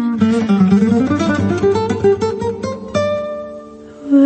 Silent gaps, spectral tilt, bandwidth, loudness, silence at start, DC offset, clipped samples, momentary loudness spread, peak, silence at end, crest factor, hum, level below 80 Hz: none; -7.5 dB/octave; 8.6 kHz; -16 LUFS; 0 s; under 0.1%; under 0.1%; 16 LU; -2 dBFS; 0 s; 14 dB; none; -46 dBFS